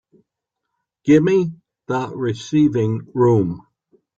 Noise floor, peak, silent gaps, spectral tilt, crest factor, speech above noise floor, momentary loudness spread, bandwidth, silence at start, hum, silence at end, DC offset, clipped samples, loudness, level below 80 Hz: -80 dBFS; -2 dBFS; none; -8 dB/octave; 16 dB; 63 dB; 12 LU; 7.8 kHz; 1.05 s; none; 0.6 s; under 0.1%; under 0.1%; -19 LUFS; -56 dBFS